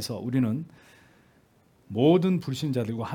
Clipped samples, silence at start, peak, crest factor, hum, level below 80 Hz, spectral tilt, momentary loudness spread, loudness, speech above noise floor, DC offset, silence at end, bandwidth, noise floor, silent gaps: under 0.1%; 0 s; -10 dBFS; 18 dB; none; -68 dBFS; -7 dB/octave; 14 LU; -26 LUFS; 36 dB; under 0.1%; 0 s; 18 kHz; -62 dBFS; none